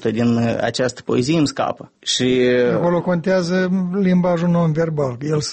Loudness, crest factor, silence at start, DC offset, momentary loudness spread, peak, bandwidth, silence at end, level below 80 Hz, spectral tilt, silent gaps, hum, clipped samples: -18 LUFS; 12 dB; 0 s; under 0.1%; 6 LU; -6 dBFS; 8.8 kHz; 0 s; -52 dBFS; -6 dB/octave; none; none; under 0.1%